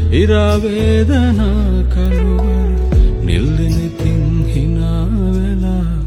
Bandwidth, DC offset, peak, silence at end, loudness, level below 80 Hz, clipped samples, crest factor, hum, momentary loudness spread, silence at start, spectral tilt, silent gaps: 11.5 kHz; under 0.1%; 0 dBFS; 0 s; -15 LUFS; -16 dBFS; under 0.1%; 12 dB; none; 4 LU; 0 s; -8 dB/octave; none